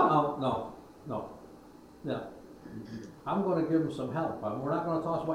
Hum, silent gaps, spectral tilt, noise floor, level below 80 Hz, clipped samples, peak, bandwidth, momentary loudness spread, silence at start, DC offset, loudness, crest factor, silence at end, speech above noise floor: none; none; -8 dB/octave; -53 dBFS; -64 dBFS; under 0.1%; -12 dBFS; 12.5 kHz; 19 LU; 0 s; under 0.1%; -32 LUFS; 20 dB; 0 s; 20 dB